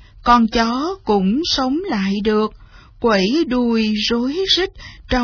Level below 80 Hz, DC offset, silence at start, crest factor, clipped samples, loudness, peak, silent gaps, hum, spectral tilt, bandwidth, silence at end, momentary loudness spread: -38 dBFS; under 0.1%; 0.15 s; 16 dB; under 0.1%; -17 LUFS; 0 dBFS; none; none; -5 dB/octave; 5.4 kHz; 0 s; 7 LU